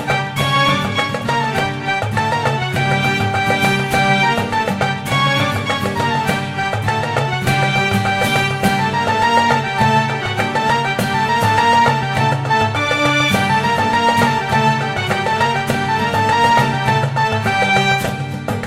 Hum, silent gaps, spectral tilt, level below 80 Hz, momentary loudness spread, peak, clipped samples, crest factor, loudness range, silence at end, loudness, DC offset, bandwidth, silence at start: none; none; -5 dB/octave; -44 dBFS; 5 LU; -2 dBFS; under 0.1%; 14 dB; 2 LU; 0 s; -16 LUFS; 0.2%; 16 kHz; 0 s